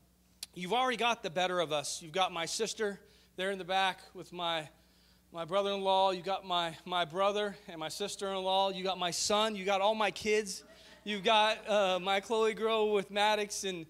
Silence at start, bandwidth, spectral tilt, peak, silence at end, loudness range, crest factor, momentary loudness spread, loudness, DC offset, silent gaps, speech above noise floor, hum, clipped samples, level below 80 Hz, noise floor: 0.4 s; 16 kHz; -2.5 dB/octave; -14 dBFS; 0.05 s; 4 LU; 18 dB; 12 LU; -32 LUFS; under 0.1%; none; 32 dB; none; under 0.1%; -70 dBFS; -65 dBFS